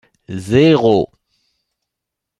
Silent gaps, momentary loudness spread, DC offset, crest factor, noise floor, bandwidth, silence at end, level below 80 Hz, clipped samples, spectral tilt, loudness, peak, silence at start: none; 18 LU; under 0.1%; 16 dB; -81 dBFS; 11.5 kHz; 1.35 s; -50 dBFS; under 0.1%; -7 dB/octave; -13 LUFS; 0 dBFS; 0.3 s